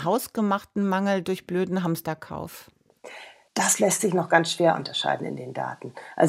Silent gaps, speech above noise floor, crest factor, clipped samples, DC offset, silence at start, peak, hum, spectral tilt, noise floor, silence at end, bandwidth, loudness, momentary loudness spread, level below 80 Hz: none; 20 dB; 22 dB; under 0.1%; under 0.1%; 0 s; -4 dBFS; none; -4 dB/octave; -45 dBFS; 0 s; 16 kHz; -25 LUFS; 18 LU; -66 dBFS